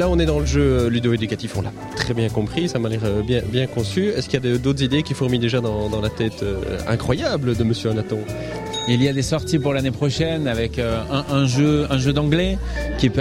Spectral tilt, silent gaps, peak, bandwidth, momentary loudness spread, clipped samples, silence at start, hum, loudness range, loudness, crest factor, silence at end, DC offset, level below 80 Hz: -6 dB/octave; none; -4 dBFS; 15 kHz; 7 LU; under 0.1%; 0 s; none; 2 LU; -21 LUFS; 16 dB; 0 s; under 0.1%; -32 dBFS